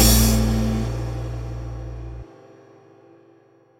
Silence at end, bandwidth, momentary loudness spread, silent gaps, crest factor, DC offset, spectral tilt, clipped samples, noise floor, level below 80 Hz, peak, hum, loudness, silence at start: 1.55 s; 17 kHz; 21 LU; none; 20 dB; under 0.1%; -4.5 dB/octave; under 0.1%; -55 dBFS; -28 dBFS; -2 dBFS; none; -23 LUFS; 0 s